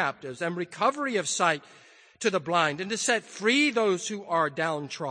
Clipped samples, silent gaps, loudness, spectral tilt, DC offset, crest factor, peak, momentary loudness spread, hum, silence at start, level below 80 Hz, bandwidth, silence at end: under 0.1%; none; -27 LUFS; -3 dB/octave; under 0.1%; 18 dB; -10 dBFS; 9 LU; none; 0 s; -78 dBFS; 9.8 kHz; 0 s